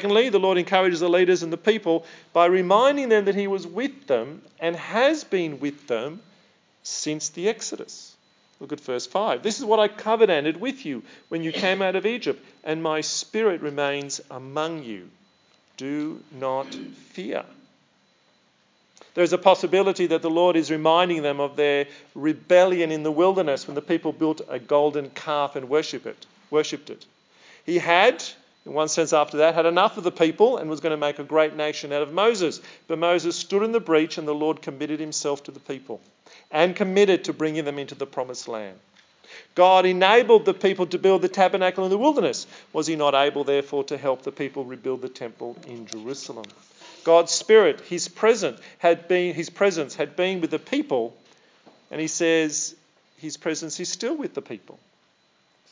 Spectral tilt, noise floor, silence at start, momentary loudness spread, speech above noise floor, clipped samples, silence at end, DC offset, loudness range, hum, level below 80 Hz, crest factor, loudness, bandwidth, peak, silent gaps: -4 dB/octave; -64 dBFS; 0 s; 16 LU; 41 dB; under 0.1%; 1.15 s; under 0.1%; 9 LU; none; -88 dBFS; 22 dB; -23 LUFS; 7.6 kHz; -2 dBFS; none